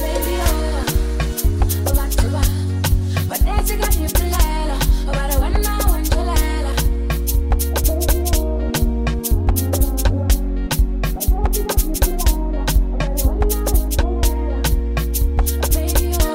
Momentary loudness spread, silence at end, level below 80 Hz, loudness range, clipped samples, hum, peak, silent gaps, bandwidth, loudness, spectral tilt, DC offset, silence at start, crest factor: 2 LU; 0 s; -18 dBFS; 1 LU; under 0.1%; none; -4 dBFS; none; 16.5 kHz; -19 LUFS; -5 dB/octave; 0.2%; 0 s; 12 dB